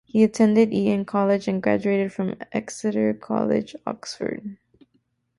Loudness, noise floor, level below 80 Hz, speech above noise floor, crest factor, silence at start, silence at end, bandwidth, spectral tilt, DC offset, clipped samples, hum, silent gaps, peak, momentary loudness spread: -23 LUFS; -69 dBFS; -62 dBFS; 47 dB; 16 dB; 0.15 s; 0.85 s; 11.5 kHz; -6.5 dB/octave; under 0.1%; under 0.1%; none; none; -6 dBFS; 13 LU